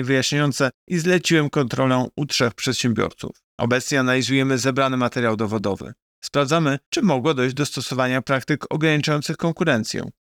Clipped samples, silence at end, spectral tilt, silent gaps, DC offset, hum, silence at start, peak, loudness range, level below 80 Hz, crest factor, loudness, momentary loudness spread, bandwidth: under 0.1%; 0.1 s; -5 dB/octave; 0.74-0.87 s, 3.44-3.58 s, 6.02-6.22 s, 6.86-6.92 s; under 0.1%; none; 0 s; -6 dBFS; 1 LU; -58 dBFS; 14 dB; -21 LUFS; 6 LU; 18 kHz